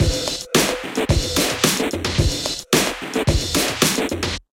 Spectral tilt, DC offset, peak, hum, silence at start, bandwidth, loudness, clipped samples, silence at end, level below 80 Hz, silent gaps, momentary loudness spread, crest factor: -3.5 dB/octave; under 0.1%; 0 dBFS; none; 0 s; 17 kHz; -19 LUFS; under 0.1%; 0.15 s; -30 dBFS; none; 5 LU; 20 dB